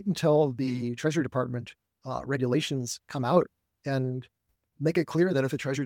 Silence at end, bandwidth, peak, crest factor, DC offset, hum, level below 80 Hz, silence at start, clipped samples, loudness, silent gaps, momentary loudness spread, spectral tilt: 0 s; 17 kHz; -6 dBFS; 22 dB; under 0.1%; none; -66 dBFS; 0 s; under 0.1%; -28 LUFS; none; 12 LU; -6 dB/octave